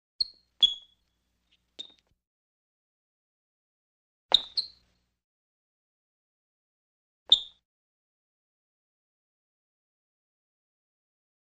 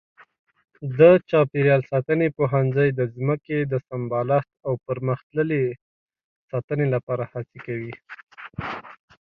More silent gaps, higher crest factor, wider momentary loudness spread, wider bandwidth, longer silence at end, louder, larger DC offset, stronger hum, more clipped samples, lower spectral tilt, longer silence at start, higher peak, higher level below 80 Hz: first, 2.27-4.29 s, 5.24-7.26 s vs 5.23-5.30 s, 5.81-6.08 s, 6.24-6.48 s, 6.64-6.68 s, 7.03-7.07 s, 8.23-8.27 s; first, 30 dB vs 20 dB; first, 22 LU vs 17 LU; first, 12.5 kHz vs 5 kHz; first, 4.05 s vs 0.45 s; second, -25 LUFS vs -22 LUFS; neither; first, 60 Hz at -85 dBFS vs none; neither; second, 0.5 dB/octave vs -10.5 dB/octave; second, 0.2 s vs 0.8 s; about the same, -6 dBFS vs -4 dBFS; second, -70 dBFS vs -60 dBFS